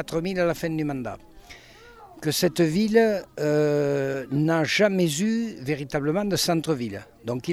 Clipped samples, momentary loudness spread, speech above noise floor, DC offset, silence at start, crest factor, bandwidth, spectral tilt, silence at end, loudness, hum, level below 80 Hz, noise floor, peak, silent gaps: under 0.1%; 11 LU; 24 dB; under 0.1%; 0 s; 18 dB; 16 kHz; -5 dB/octave; 0 s; -24 LUFS; none; -54 dBFS; -48 dBFS; -8 dBFS; none